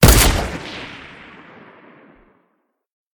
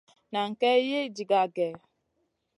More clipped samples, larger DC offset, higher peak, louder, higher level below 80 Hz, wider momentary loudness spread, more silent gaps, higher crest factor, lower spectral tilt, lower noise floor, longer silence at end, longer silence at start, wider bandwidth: neither; neither; first, 0 dBFS vs -12 dBFS; first, -17 LUFS vs -27 LUFS; first, -24 dBFS vs -80 dBFS; first, 28 LU vs 8 LU; neither; about the same, 20 dB vs 16 dB; about the same, -4 dB/octave vs -4.5 dB/octave; second, -68 dBFS vs -77 dBFS; first, 2.2 s vs 0.8 s; second, 0 s vs 0.3 s; first, 18 kHz vs 11 kHz